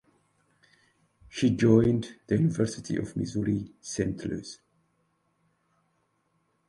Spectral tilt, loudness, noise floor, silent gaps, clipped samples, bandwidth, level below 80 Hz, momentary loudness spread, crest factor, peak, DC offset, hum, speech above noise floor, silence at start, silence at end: -7 dB/octave; -28 LUFS; -73 dBFS; none; under 0.1%; 11.5 kHz; -56 dBFS; 16 LU; 22 dB; -8 dBFS; under 0.1%; none; 47 dB; 1.35 s; 2.15 s